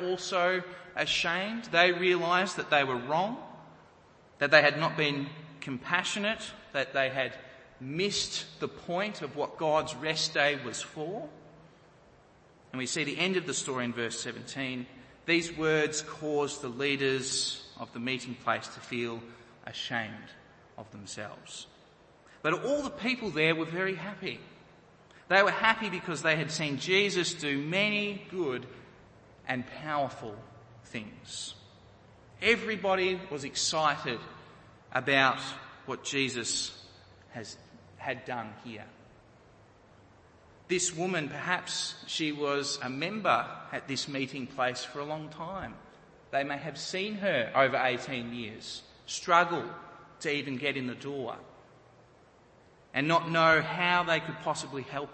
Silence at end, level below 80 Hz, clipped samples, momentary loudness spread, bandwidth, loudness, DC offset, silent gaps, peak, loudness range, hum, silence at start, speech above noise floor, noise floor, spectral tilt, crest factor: 0 s; -68 dBFS; under 0.1%; 17 LU; 8.8 kHz; -30 LUFS; under 0.1%; none; -4 dBFS; 9 LU; none; 0 s; 29 dB; -59 dBFS; -3.5 dB/octave; 28 dB